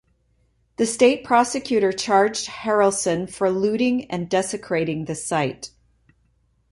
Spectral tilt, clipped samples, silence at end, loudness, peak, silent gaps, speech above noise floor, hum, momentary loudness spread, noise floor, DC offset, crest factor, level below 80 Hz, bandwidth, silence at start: -4 dB/octave; under 0.1%; 1.05 s; -21 LUFS; -2 dBFS; none; 43 dB; none; 9 LU; -64 dBFS; under 0.1%; 20 dB; -58 dBFS; 11.5 kHz; 0.8 s